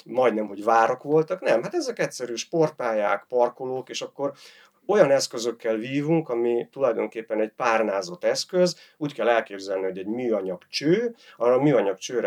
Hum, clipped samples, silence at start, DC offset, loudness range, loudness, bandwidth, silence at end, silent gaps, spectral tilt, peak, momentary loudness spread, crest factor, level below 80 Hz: none; under 0.1%; 0.05 s; under 0.1%; 2 LU; -24 LUFS; 14.5 kHz; 0 s; none; -5 dB/octave; -2 dBFS; 10 LU; 22 dB; -86 dBFS